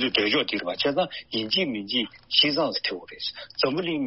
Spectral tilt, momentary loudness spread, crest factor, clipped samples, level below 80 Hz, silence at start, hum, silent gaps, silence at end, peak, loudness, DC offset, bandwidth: -1 dB/octave; 10 LU; 20 dB; under 0.1%; -64 dBFS; 0 s; none; none; 0 s; -6 dBFS; -25 LUFS; under 0.1%; 6 kHz